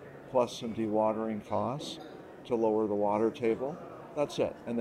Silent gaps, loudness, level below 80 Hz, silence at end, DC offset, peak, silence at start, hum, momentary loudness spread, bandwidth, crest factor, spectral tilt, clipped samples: none; -32 LUFS; -68 dBFS; 0 s; under 0.1%; -14 dBFS; 0 s; none; 12 LU; 13.5 kHz; 18 dB; -6 dB/octave; under 0.1%